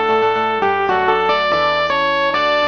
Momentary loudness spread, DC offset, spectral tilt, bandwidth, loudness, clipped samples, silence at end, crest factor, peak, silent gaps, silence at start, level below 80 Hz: 2 LU; 0.3%; -4.5 dB/octave; 6.6 kHz; -16 LUFS; under 0.1%; 0 s; 16 dB; 0 dBFS; none; 0 s; -50 dBFS